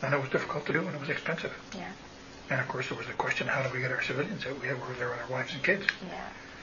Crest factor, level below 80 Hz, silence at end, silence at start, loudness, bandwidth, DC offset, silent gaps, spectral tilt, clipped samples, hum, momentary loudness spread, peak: 26 dB; -62 dBFS; 0 s; 0 s; -32 LUFS; 7.2 kHz; under 0.1%; none; -5 dB/octave; under 0.1%; none; 12 LU; -6 dBFS